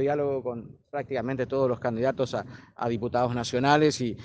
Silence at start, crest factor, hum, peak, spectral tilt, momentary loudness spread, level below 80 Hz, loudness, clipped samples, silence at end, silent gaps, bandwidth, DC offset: 0 s; 22 dB; none; -6 dBFS; -5.5 dB/octave; 14 LU; -60 dBFS; -27 LUFS; under 0.1%; 0 s; none; 9.6 kHz; under 0.1%